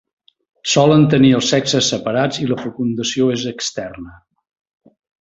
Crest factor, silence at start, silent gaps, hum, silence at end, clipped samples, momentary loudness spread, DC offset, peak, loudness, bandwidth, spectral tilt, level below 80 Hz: 16 dB; 0.65 s; none; none; 1.05 s; under 0.1%; 13 LU; under 0.1%; -2 dBFS; -16 LUFS; 8 kHz; -5 dB/octave; -52 dBFS